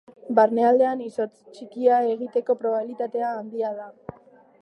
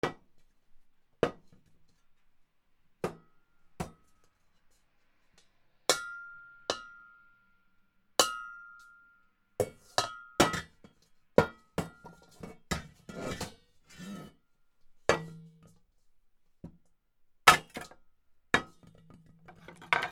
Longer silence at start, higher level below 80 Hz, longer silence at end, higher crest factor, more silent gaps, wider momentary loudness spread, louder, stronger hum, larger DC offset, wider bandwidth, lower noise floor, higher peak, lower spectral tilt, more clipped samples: first, 0.25 s vs 0.05 s; second, -70 dBFS vs -60 dBFS; first, 0.55 s vs 0 s; second, 18 dB vs 36 dB; neither; about the same, 21 LU vs 23 LU; first, -23 LUFS vs -31 LUFS; neither; neither; second, 9 kHz vs 18.5 kHz; second, -52 dBFS vs -68 dBFS; second, -6 dBFS vs 0 dBFS; first, -7 dB/octave vs -2.5 dB/octave; neither